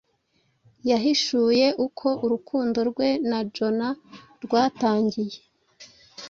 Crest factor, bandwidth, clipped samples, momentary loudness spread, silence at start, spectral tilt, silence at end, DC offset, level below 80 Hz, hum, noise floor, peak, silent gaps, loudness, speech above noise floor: 18 dB; 7.6 kHz; under 0.1%; 11 LU; 0.85 s; -4.5 dB/octave; 0 s; under 0.1%; -66 dBFS; none; -69 dBFS; -8 dBFS; none; -24 LUFS; 45 dB